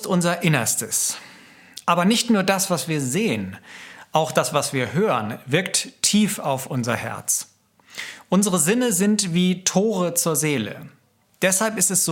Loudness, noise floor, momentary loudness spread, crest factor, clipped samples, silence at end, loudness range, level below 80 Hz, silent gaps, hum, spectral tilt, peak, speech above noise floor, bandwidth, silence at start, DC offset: -21 LUFS; -47 dBFS; 15 LU; 20 dB; under 0.1%; 0 s; 2 LU; -66 dBFS; none; none; -3.5 dB/octave; -2 dBFS; 26 dB; 17 kHz; 0 s; under 0.1%